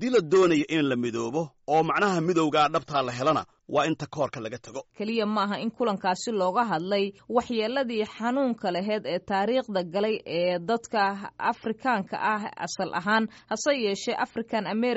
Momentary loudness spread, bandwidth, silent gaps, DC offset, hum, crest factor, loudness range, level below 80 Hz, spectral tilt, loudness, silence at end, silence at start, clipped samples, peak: 7 LU; 8 kHz; none; under 0.1%; none; 16 dB; 3 LU; -66 dBFS; -3.5 dB/octave; -27 LUFS; 0 s; 0 s; under 0.1%; -10 dBFS